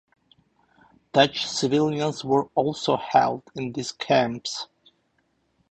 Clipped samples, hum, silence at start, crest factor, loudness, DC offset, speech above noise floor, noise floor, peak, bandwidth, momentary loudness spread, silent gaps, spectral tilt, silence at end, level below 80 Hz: under 0.1%; none; 1.15 s; 22 dB; -24 LUFS; under 0.1%; 46 dB; -69 dBFS; -4 dBFS; 9 kHz; 11 LU; none; -4.5 dB/octave; 1.05 s; -62 dBFS